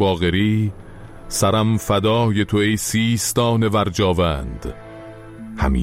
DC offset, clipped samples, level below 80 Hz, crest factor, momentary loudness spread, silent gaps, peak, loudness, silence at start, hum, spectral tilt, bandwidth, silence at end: under 0.1%; under 0.1%; -34 dBFS; 14 dB; 19 LU; none; -6 dBFS; -19 LUFS; 0 s; none; -5 dB/octave; 16 kHz; 0 s